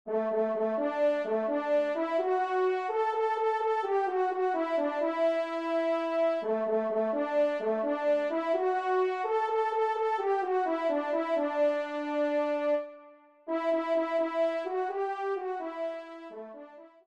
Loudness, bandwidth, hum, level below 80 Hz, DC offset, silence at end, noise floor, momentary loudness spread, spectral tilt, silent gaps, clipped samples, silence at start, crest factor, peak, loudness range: -29 LUFS; 8.8 kHz; none; -82 dBFS; under 0.1%; 0.2 s; -55 dBFS; 5 LU; -5.5 dB/octave; none; under 0.1%; 0.05 s; 12 dB; -18 dBFS; 2 LU